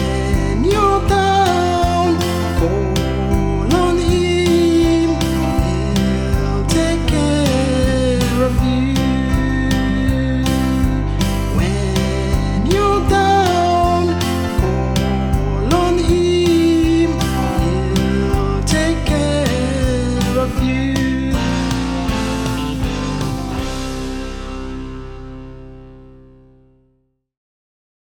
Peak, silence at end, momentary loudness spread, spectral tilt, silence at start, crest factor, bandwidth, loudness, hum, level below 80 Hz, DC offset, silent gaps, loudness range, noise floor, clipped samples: 0 dBFS; 2.1 s; 7 LU; -6 dB/octave; 0 s; 16 dB; over 20 kHz; -16 LUFS; none; -24 dBFS; under 0.1%; none; 7 LU; -62 dBFS; under 0.1%